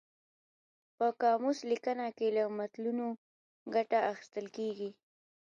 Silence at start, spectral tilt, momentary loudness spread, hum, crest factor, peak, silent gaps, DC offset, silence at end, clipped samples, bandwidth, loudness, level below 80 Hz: 1 s; -5 dB/octave; 12 LU; none; 18 dB; -18 dBFS; 3.18-3.66 s; under 0.1%; 0.5 s; under 0.1%; 7.4 kHz; -34 LUFS; -88 dBFS